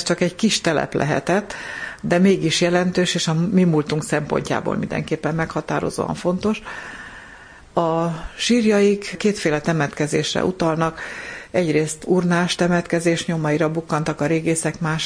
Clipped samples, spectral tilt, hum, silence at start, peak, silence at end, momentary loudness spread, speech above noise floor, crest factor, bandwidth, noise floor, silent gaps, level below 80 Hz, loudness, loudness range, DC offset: under 0.1%; -5 dB/octave; none; 0 s; -2 dBFS; 0 s; 10 LU; 23 dB; 18 dB; 10.5 kHz; -43 dBFS; none; -48 dBFS; -20 LUFS; 5 LU; under 0.1%